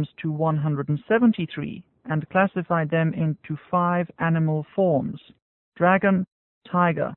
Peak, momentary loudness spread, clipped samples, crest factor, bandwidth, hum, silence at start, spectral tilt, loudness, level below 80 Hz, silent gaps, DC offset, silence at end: -6 dBFS; 12 LU; under 0.1%; 18 dB; 4 kHz; none; 0 s; -12.5 dB/octave; -23 LUFS; -62 dBFS; 5.42-5.72 s, 6.32-6.61 s; under 0.1%; 0 s